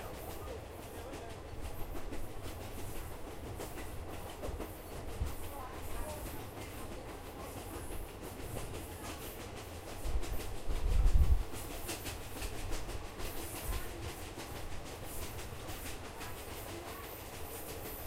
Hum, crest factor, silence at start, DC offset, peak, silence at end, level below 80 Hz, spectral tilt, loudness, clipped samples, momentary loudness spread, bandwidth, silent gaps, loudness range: none; 22 dB; 0 s; under 0.1%; -16 dBFS; 0 s; -40 dBFS; -4.5 dB/octave; -43 LUFS; under 0.1%; 5 LU; 16 kHz; none; 7 LU